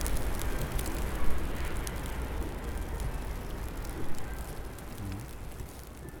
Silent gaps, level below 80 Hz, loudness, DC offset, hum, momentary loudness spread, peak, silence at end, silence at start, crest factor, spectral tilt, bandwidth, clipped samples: none; -36 dBFS; -38 LUFS; under 0.1%; none; 9 LU; -10 dBFS; 0 s; 0 s; 20 dB; -5 dB/octave; 20 kHz; under 0.1%